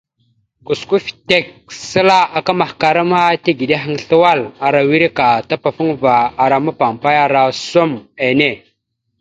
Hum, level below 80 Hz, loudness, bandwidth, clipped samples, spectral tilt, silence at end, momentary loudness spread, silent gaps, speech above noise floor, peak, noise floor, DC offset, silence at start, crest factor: none; -54 dBFS; -14 LUFS; 9.2 kHz; under 0.1%; -5 dB/octave; 0.65 s; 7 LU; none; 55 dB; 0 dBFS; -69 dBFS; under 0.1%; 0.7 s; 14 dB